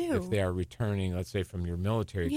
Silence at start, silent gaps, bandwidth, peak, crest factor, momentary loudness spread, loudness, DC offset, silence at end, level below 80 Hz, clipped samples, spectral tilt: 0 s; none; 15.5 kHz; -16 dBFS; 14 dB; 4 LU; -32 LUFS; under 0.1%; 0 s; -48 dBFS; under 0.1%; -7 dB/octave